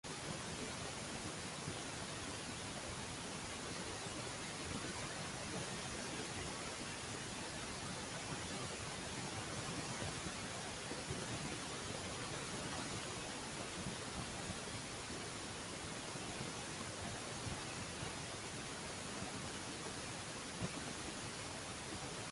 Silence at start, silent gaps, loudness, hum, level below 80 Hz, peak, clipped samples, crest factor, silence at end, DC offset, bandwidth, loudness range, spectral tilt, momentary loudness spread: 0.05 s; none; -44 LUFS; none; -62 dBFS; -28 dBFS; under 0.1%; 16 dB; 0 s; under 0.1%; 11.5 kHz; 1 LU; -3 dB/octave; 2 LU